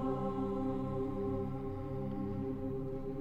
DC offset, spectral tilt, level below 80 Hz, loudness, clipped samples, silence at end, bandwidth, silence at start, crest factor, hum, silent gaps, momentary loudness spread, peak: under 0.1%; -10 dB/octave; -48 dBFS; -38 LUFS; under 0.1%; 0 s; 7.4 kHz; 0 s; 12 dB; none; none; 4 LU; -24 dBFS